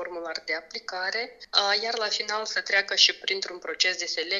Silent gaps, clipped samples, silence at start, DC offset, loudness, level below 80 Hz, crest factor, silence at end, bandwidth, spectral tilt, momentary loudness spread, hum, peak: none; under 0.1%; 0 s; under 0.1%; -25 LUFS; -72 dBFS; 26 dB; 0 s; 7.8 kHz; 1 dB/octave; 12 LU; none; -2 dBFS